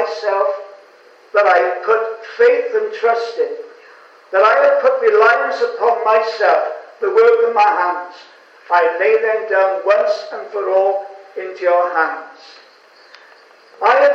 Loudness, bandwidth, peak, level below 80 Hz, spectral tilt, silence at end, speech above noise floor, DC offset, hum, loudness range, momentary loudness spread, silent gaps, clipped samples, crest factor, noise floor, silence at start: -15 LUFS; 7.2 kHz; 0 dBFS; -74 dBFS; -2.5 dB/octave; 0 s; 32 dB; under 0.1%; none; 5 LU; 12 LU; none; under 0.1%; 16 dB; -46 dBFS; 0 s